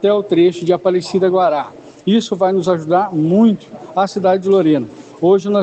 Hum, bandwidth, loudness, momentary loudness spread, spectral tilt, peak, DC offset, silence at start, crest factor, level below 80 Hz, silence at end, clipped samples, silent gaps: none; 8.6 kHz; -15 LUFS; 9 LU; -7 dB/octave; -2 dBFS; under 0.1%; 0 s; 12 dB; -62 dBFS; 0 s; under 0.1%; none